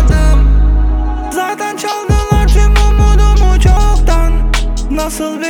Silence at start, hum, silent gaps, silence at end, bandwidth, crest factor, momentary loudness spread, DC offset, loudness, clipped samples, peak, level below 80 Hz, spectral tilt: 0 s; none; none; 0 s; 13 kHz; 8 dB; 7 LU; under 0.1%; -12 LUFS; under 0.1%; 0 dBFS; -10 dBFS; -5.5 dB/octave